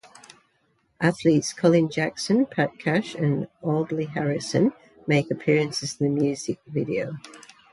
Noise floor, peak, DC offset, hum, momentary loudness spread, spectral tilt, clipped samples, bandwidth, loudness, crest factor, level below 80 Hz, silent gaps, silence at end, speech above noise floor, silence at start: -68 dBFS; -6 dBFS; under 0.1%; none; 9 LU; -6 dB/octave; under 0.1%; 11.5 kHz; -24 LUFS; 18 dB; -64 dBFS; none; 0.35 s; 44 dB; 1 s